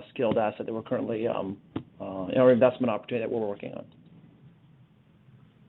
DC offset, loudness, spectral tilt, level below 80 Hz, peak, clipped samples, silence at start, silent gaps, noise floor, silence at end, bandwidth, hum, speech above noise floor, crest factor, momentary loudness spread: under 0.1%; -27 LUFS; -10 dB/octave; -66 dBFS; -8 dBFS; under 0.1%; 0 s; none; -58 dBFS; 1.2 s; 4.1 kHz; none; 32 dB; 22 dB; 17 LU